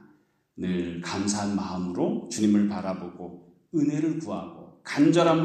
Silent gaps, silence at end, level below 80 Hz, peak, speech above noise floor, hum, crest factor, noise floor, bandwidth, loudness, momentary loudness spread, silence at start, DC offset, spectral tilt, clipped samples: none; 0 s; -64 dBFS; -8 dBFS; 37 dB; none; 18 dB; -63 dBFS; 9.6 kHz; -27 LUFS; 16 LU; 0.55 s; under 0.1%; -5.5 dB/octave; under 0.1%